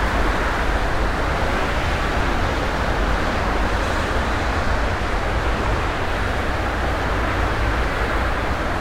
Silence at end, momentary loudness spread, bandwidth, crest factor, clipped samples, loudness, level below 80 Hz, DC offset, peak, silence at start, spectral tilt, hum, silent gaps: 0 s; 1 LU; 15.5 kHz; 12 dB; under 0.1%; -22 LUFS; -24 dBFS; under 0.1%; -8 dBFS; 0 s; -5.5 dB/octave; none; none